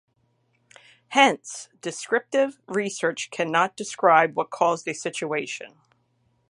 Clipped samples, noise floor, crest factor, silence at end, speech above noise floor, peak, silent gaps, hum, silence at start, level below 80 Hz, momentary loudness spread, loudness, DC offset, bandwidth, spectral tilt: under 0.1%; -68 dBFS; 24 dB; 0.85 s; 45 dB; -2 dBFS; none; none; 1.1 s; -78 dBFS; 15 LU; -24 LUFS; under 0.1%; 11.5 kHz; -3 dB/octave